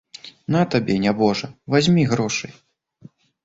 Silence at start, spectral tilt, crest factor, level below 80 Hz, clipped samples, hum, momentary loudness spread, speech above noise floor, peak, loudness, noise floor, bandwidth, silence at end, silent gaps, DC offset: 0.25 s; -5.5 dB/octave; 18 dB; -54 dBFS; under 0.1%; none; 15 LU; 29 dB; -4 dBFS; -20 LUFS; -49 dBFS; 8 kHz; 0.95 s; none; under 0.1%